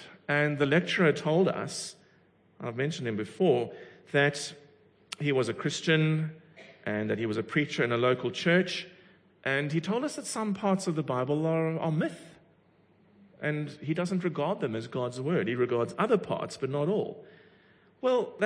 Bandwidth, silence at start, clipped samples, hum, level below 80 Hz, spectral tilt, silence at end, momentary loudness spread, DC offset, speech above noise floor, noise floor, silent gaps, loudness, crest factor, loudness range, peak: 10.5 kHz; 0 s; under 0.1%; none; -74 dBFS; -5.5 dB/octave; 0 s; 11 LU; under 0.1%; 35 dB; -64 dBFS; none; -29 LUFS; 18 dB; 4 LU; -12 dBFS